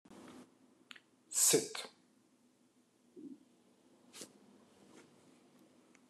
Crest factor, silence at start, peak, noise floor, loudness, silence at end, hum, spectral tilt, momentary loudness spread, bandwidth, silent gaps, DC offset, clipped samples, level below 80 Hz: 26 dB; 0.1 s; -16 dBFS; -72 dBFS; -32 LUFS; 1.85 s; none; -1.5 dB/octave; 29 LU; 13 kHz; none; under 0.1%; under 0.1%; under -90 dBFS